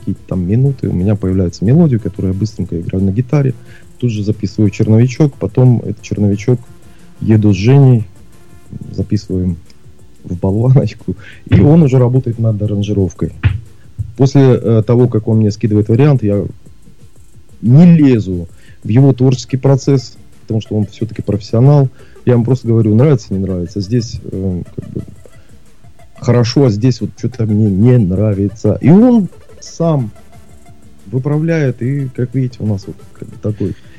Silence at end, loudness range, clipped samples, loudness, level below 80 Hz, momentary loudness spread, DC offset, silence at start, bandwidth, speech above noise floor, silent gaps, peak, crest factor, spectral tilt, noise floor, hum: 0.25 s; 6 LU; under 0.1%; -13 LUFS; -40 dBFS; 14 LU; 2%; 0 s; 7.8 kHz; 31 dB; none; 0 dBFS; 12 dB; -8.5 dB/octave; -43 dBFS; none